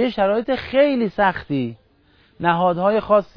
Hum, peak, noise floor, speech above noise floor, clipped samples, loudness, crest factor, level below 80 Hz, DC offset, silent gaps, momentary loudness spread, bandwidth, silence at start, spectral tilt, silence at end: none; -2 dBFS; -56 dBFS; 38 dB; under 0.1%; -19 LUFS; 16 dB; -50 dBFS; under 0.1%; none; 8 LU; 5.4 kHz; 0 s; -8.5 dB/octave; 0.15 s